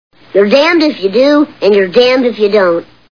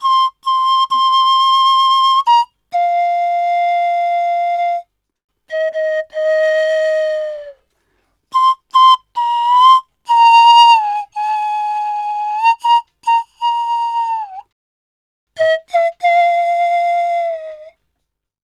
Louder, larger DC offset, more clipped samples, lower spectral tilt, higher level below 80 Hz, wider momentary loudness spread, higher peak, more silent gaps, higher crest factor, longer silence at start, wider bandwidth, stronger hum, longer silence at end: first, -10 LUFS vs -13 LUFS; first, 0.5% vs under 0.1%; first, 0.3% vs under 0.1%; first, -5.5 dB/octave vs 1.5 dB/octave; first, -54 dBFS vs -68 dBFS; second, 5 LU vs 11 LU; about the same, 0 dBFS vs 0 dBFS; second, none vs 5.24-5.28 s, 14.52-15.27 s; about the same, 10 dB vs 14 dB; first, 0.35 s vs 0 s; second, 5.4 kHz vs 12.5 kHz; second, none vs 50 Hz at -75 dBFS; second, 0.3 s vs 0.8 s